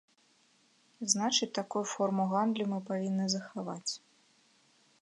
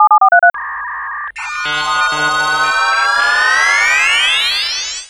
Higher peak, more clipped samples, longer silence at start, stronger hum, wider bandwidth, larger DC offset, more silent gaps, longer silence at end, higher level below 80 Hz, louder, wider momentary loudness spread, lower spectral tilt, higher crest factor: second, -10 dBFS vs 0 dBFS; neither; first, 1 s vs 0 s; neither; second, 11 kHz vs 15.5 kHz; neither; neither; first, 1.05 s vs 0 s; second, -86 dBFS vs -48 dBFS; second, -32 LUFS vs -12 LUFS; second, 10 LU vs 13 LU; first, -3.5 dB/octave vs 0.5 dB/octave; first, 24 dB vs 14 dB